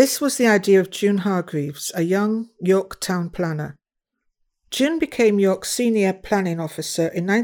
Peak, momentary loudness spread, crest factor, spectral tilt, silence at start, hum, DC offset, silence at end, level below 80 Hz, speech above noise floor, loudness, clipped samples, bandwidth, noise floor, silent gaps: -2 dBFS; 9 LU; 20 dB; -5 dB/octave; 0 s; none; under 0.1%; 0 s; -56 dBFS; 57 dB; -21 LUFS; under 0.1%; over 20 kHz; -77 dBFS; none